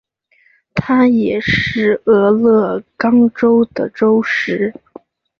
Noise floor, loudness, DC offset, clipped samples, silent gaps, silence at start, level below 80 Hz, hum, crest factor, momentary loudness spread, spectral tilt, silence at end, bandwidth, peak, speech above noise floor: -55 dBFS; -14 LUFS; under 0.1%; under 0.1%; none; 0.75 s; -46 dBFS; none; 12 dB; 8 LU; -7 dB/octave; 0.7 s; 6.6 kHz; -2 dBFS; 42 dB